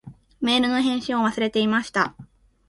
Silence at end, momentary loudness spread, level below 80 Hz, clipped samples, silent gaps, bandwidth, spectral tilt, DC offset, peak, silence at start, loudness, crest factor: 0.45 s; 5 LU; -58 dBFS; under 0.1%; none; 11.5 kHz; -4.5 dB/octave; under 0.1%; -6 dBFS; 0.05 s; -22 LUFS; 18 dB